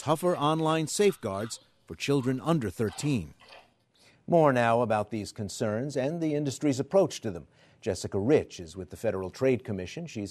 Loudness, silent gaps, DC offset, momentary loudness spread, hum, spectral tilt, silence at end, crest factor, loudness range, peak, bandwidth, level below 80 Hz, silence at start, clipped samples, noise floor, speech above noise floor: -28 LUFS; none; under 0.1%; 13 LU; none; -5.5 dB/octave; 0 s; 20 dB; 3 LU; -10 dBFS; 13.5 kHz; -62 dBFS; 0 s; under 0.1%; -63 dBFS; 34 dB